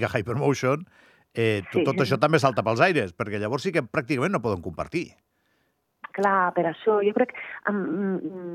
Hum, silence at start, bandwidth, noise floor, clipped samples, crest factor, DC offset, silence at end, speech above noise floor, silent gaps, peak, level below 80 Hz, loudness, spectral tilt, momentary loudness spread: none; 0 s; 14 kHz; -71 dBFS; under 0.1%; 20 dB; under 0.1%; 0 s; 47 dB; none; -4 dBFS; -62 dBFS; -25 LUFS; -6.5 dB/octave; 10 LU